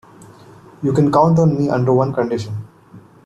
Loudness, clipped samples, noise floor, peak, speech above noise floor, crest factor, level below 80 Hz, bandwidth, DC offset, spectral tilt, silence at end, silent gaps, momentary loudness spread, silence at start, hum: -16 LUFS; under 0.1%; -44 dBFS; -2 dBFS; 28 dB; 16 dB; -50 dBFS; 8.6 kHz; under 0.1%; -8.5 dB/octave; 0.25 s; none; 11 LU; 0.8 s; none